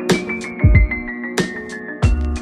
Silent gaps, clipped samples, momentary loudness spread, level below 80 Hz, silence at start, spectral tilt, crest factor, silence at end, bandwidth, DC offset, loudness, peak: none; under 0.1%; 10 LU; -22 dBFS; 0 s; -6 dB/octave; 18 dB; 0 s; 13.5 kHz; under 0.1%; -19 LUFS; 0 dBFS